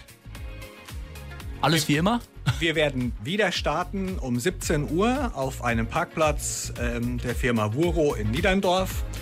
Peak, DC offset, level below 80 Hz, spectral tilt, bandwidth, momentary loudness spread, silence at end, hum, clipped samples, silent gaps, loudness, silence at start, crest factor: -10 dBFS; under 0.1%; -36 dBFS; -5 dB/octave; 16 kHz; 17 LU; 0 s; none; under 0.1%; none; -25 LUFS; 0 s; 14 dB